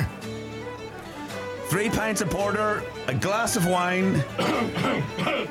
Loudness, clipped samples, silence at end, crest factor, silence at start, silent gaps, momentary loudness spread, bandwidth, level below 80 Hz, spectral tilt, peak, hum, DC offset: -26 LUFS; under 0.1%; 0 s; 16 dB; 0 s; none; 13 LU; 17.5 kHz; -50 dBFS; -4.5 dB/octave; -10 dBFS; none; under 0.1%